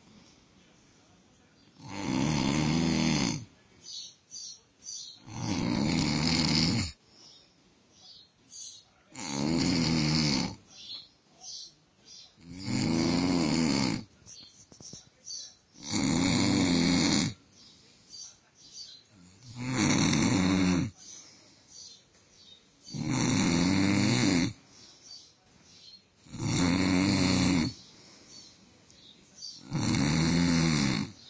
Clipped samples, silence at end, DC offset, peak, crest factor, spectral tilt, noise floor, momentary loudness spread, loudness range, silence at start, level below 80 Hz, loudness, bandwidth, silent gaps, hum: under 0.1%; 0 s; under 0.1%; -12 dBFS; 20 dB; -4.5 dB/octave; -63 dBFS; 23 LU; 3 LU; 1.8 s; -50 dBFS; -28 LUFS; 8 kHz; none; none